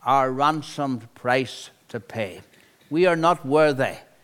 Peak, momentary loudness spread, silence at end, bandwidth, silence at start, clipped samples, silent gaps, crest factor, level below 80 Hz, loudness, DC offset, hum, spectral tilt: -6 dBFS; 14 LU; 0.25 s; 16.5 kHz; 0.05 s; under 0.1%; none; 18 dB; -66 dBFS; -23 LUFS; under 0.1%; none; -5.5 dB/octave